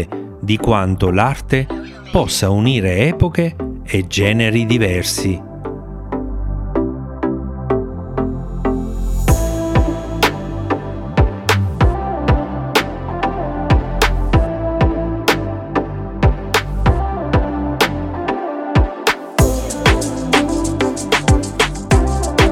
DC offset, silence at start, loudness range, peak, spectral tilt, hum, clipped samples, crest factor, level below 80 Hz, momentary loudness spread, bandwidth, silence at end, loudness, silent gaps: under 0.1%; 0 s; 4 LU; 0 dBFS; -5.5 dB/octave; none; under 0.1%; 16 dB; -24 dBFS; 8 LU; 17 kHz; 0 s; -17 LUFS; none